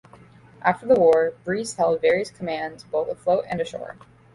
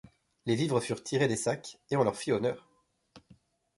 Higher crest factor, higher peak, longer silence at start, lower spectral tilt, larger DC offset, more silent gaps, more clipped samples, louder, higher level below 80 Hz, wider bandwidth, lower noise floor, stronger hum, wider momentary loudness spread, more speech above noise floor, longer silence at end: about the same, 18 dB vs 20 dB; first, -6 dBFS vs -12 dBFS; first, 0.65 s vs 0.45 s; about the same, -5 dB/octave vs -5 dB/octave; neither; neither; neither; first, -23 LUFS vs -31 LUFS; first, -58 dBFS vs -68 dBFS; about the same, 11.5 kHz vs 11.5 kHz; second, -49 dBFS vs -66 dBFS; neither; first, 12 LU vs 8 LU; second, 27 dB vs 36 dB; second, 0.4 s vs 0.6 s